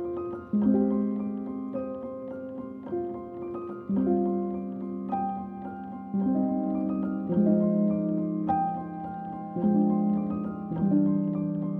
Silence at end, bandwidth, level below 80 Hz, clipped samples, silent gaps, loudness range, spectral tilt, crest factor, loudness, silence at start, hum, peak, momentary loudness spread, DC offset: 0 s; 2.7 kHz; -60 dBFS; under 0.1%; none; 5 LU; -12.5 dB/octave; 16 dB; -29 LUFS; 0 s; none; -12 dBFS; 13 LU; under 0.1%